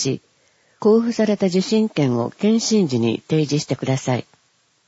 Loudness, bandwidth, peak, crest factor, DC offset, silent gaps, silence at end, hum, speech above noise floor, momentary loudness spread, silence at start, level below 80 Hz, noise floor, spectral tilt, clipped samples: -19 LUFS; 8 kHz; -6 dBFS; 14 dB; under 0.1%; none; 0.65 s; none; 44 dB; 6 LU; 0 s; -62 dBFS; -62 dBFS; -5.5 dB/octave; under 0.1%